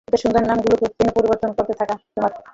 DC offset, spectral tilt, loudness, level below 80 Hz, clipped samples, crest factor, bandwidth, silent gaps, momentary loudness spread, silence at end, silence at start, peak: under 0.1%; -6.5 dB/octave; -19 LUFS; -44 dBFS; under 0.1%; 16 dB; 7.8 kHz; none; 6 LU; 0.15 s; 0.1 s; -4 dBFS